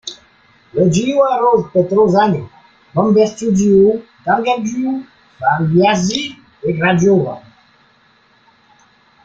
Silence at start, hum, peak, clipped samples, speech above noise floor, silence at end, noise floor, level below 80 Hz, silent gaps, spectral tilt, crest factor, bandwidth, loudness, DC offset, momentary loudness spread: 0.05 s; none; -2 dBFS; under 0.1%; 39 dB; 1.85 s; -53 dBFS; -50 dBFS; none; -6 dB/octave; 14 dB; 7.8 kHz; -15 LUFS; under 0.1%; 12 LU